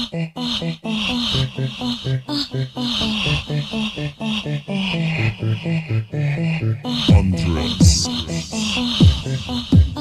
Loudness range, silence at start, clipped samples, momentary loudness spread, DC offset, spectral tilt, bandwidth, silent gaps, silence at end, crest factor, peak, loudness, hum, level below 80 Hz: 5 LU; 0 s; under 0.1%; 9 LU; under 0.1%; -5 dB/octave; 13.5 kHz; none; 0 s; 18 dB; 0 dBFS; -20 LUFS; none; -30 dBFS